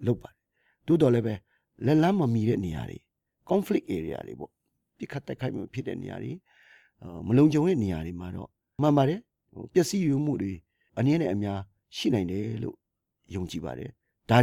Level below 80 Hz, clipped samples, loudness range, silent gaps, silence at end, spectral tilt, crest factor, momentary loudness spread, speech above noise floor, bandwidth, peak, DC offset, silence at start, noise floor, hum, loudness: -56 dBFS; under 0.1%; 7 LU; none; 0 s; -7 dB/octave; 20 dB; 19 LU; 45 dB; 15.5 kHz; -8 dBFS; under 0.1%; 0 s; -72 dBFS; none; -28 LUFS